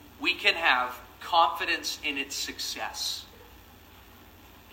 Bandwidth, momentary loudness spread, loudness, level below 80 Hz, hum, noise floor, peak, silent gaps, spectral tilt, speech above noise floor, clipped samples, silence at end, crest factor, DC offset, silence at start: 16 kHz; 11 LU; -27 LUFS; -58 dBFS; none; -52 dBFS; -6 dBFS; none; -0.5 dB/octave; 24 dB; under 0.1%; 0 s; 26 dB; under 0.1%; 0 s